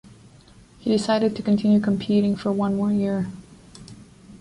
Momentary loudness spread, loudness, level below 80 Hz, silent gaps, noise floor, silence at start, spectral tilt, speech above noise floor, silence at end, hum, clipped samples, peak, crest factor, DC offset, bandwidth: 13 LU; -22 LUFS; -54 dBFS; none; -50 dBFS; 0.85 s; -7 dB/octave; 29 dB; 0.05 s; none; under 0.1%; -8 dBFS; 14 dB; under 0.1%; 11 kHz